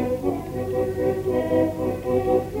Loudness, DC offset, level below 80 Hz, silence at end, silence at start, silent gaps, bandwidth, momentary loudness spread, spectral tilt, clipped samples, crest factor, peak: -24 LUFS; under 0.1%; -44 dBFS; 0 s; 0 s; none; 16 kHz; 5 LU; -8 dB/octave; under 0.1%; 14 dB; -8 dBFS